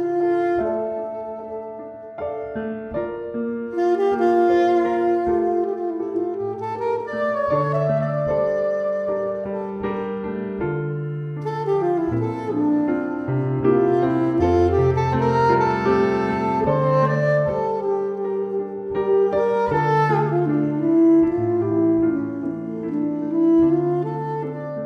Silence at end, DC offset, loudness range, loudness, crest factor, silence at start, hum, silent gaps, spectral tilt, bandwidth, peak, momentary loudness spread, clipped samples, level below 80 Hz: 0 s; under 0.1%; 6 LU; -21 LUFS; 14 dB; 0 s; none; none; -9 dB/octave; 6.6 kHz; -6 dBFS; 10 LU; under 0.1%; -48 dBFS